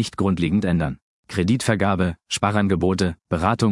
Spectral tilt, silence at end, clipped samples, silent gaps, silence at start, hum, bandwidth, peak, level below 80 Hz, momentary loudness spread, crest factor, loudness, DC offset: -6 dB/octave; 0 s; under 0.1%; 1.02-1.23 s; 0 s; none; 12 kHz; -2 dBFS; -46 dBFS; 5 LU; 18 dB; -21 LUFS; under 0.1%